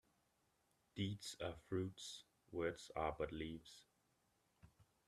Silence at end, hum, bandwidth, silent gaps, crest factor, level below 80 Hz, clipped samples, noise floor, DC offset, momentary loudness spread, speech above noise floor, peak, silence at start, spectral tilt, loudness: 0.25 s; none; 13.5 kHz; none; 22 dB; -68 dBFS; under 0.1%; -82 dBFS; under 0.1%; 13 LU; 36 dB; -26 dBFS; 0.95 s; -5 dB/octave; -47 LUFS